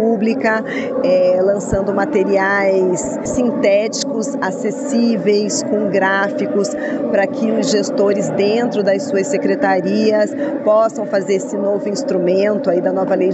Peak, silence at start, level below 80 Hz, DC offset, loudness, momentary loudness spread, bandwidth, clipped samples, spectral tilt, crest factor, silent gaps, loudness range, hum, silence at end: -2 dBFS; 0 s; -48 dBFS; under 0.1%; -16 LUFS; 5 LU; 9 kHz; under 0.1%; -5 dB/octave; 14 dB; none; 1 LU; none; 0 s